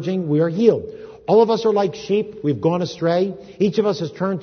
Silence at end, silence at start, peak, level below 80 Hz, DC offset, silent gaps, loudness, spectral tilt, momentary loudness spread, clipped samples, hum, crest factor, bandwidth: 0 s; 0 s; -2 dBFS; -58 dBFS; under 0.1%; none; -19 LUFS; -7.5 dB/octave; 8 LU; under 0.1%; none; 18 dB; 6.6 kHz